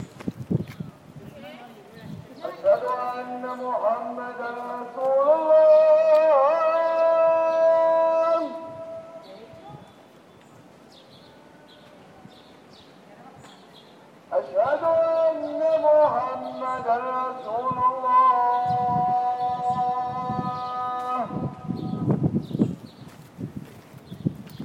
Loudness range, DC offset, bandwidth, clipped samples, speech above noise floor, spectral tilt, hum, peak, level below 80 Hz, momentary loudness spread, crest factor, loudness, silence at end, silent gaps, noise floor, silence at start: 10 LU; under 0.1%; 8.2 kHz; under 0.1%; 28 dB; -8 dB/octave; none; -8 dBFS; -62 dBFS; 22 LU; 16 dB; -23 LUFS; 0 s; none; -51 dBFS; 0 s